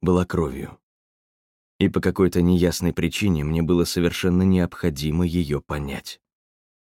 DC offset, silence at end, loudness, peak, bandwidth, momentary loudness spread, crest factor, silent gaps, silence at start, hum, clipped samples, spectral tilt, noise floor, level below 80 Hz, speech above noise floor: under 0.1%; 0.75 s; -22 LUFS; -6 dBFS; 16.5 kHz; 10 LU; 16 dB; 0.83-1.79 s; 0 s; none; under 0.1%; -6.5 dB/octave; under -90 dBFS; -40 dBFS; over 69 dB